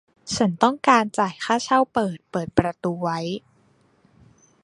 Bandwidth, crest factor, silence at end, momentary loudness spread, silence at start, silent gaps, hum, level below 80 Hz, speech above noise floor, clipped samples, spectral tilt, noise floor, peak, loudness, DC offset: 11.5 kHz; 22 dB; 1.25 s; 11 LU; 0.25 s; none; none; -52 dBFS; 39 dB; under 0.1%; -5 dB/octave; -60 dBFS; -2 dBFS; -22 LUFS; under 0.1%